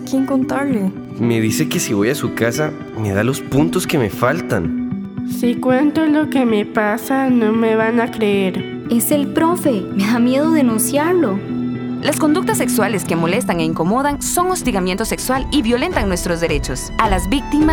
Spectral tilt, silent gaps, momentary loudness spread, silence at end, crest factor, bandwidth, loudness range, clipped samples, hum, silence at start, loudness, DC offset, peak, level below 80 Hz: -5 dB/octave; none; 6 LU; 0 s; 16 dB; over 20 kHz; 2 LU; under 0.1%; none; 0 s; -17 LUFS; under 0.1%; 0 dBFS; -34 dBFS